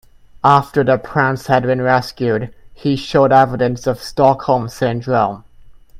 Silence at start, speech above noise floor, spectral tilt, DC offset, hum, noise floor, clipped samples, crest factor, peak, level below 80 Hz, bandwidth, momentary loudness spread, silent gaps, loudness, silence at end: 0.45 s; 26 dB; -6.5 dB/octave; under 0.1%; none; -41 dBFS; under 0.1%; 16 dB; 0 dBFS; -44 dBFS; 15.5 kHz; 9 LU; none; -16 LUFS; 0 s